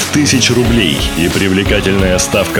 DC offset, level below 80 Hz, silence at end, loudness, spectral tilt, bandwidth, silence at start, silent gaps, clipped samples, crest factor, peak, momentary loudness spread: under 0.1%; -24 dBFS; 0 s; -11 LUFS; -4 dB/octave; 19.5 kHz; 0 s; none; under 0.1%; 12 dB; 0 dBFS; 3 LU